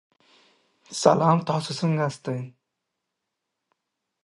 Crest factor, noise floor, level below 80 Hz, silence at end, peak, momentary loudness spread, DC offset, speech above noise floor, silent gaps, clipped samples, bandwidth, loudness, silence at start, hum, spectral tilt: 24 dB; -82 dBFS; -70 dBFS; 1.75 s; -2 dBFS; 15 LU; under 0.1%; 59 dB; none; under 0.1%; 11.5 kHz; -24 LUFS; 0.9 s; none; -6 dB/octave